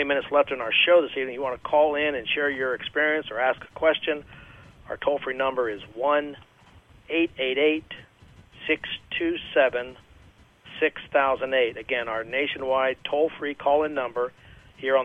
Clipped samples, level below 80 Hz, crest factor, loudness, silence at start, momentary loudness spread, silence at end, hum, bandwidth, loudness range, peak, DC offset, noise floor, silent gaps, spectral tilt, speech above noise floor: under 0.1%; -58 dBFS; 18 dB; -25 LUFS; 0 s; 9 LU; 0 s; none; 4.3 kHz; 5 LU; -8 dBFS; under 0.1%; -54 dBFS; none; -5.5 dB/octave; 29 dB